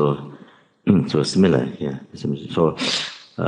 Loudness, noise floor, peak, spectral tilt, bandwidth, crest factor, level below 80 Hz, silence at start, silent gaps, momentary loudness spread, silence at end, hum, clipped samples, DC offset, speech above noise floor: -21 LUFS; -49 dBFS; -2 dBFS; -6 dB/octave; 10.5 kHz; 20 dB; -60 dBFS; 0 s; none; 12 LU; 0 s; none; under 0.1%; under 0.1%; 29 dB